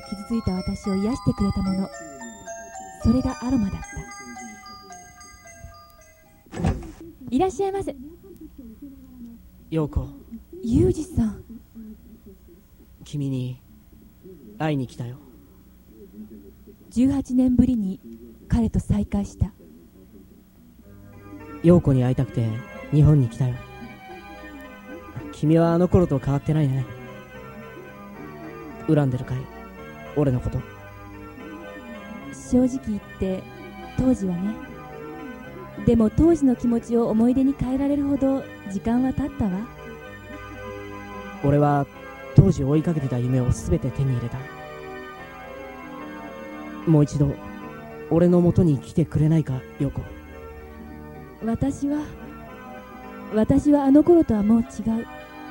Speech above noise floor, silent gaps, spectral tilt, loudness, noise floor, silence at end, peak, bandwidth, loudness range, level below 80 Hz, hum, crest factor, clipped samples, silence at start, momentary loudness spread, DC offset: 31 dB; none; -8 dB/octave; -22 LUFS; -52 dBFS; 0 s; 0 dBFS; 16.5 kHz; 10 LU; -40 dBFS; none; 24 dB; under 0.1%; 0 s; 22 LU; under 0.1%